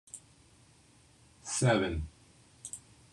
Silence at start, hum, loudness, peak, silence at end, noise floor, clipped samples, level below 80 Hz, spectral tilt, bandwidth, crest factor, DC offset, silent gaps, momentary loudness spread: 0.15 s; none; -32 LUFS; -16 dBFS; 0.35 s; -62 dBFS; under 0.1%; -54 dBFS; -4.5 dB/octave; 12.5 kHz; 20 dB; under 0.1%; none; 21 LU